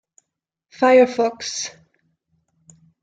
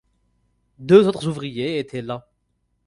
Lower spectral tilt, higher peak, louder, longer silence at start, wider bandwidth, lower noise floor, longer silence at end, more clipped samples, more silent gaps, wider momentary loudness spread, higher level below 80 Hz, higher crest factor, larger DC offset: second, -2.5 dB/octave vs -7 dB/octave; about the same, -4 dBFS vs -2 dBFS; about the same, -18 LUFS vs -19 LUFS; about the same, 0.8 s vs 0.8 s; second, 9 kHz vs 11 kHz; first, -80 dBFS vs -70 dBFS; first, 1.35 s vs 0.65 s; neither; neither; second, 14 LU vs 18 LU; second, -70 dBFS vs -58 dBFS; about the same, 18 dB vs 20 dB; neither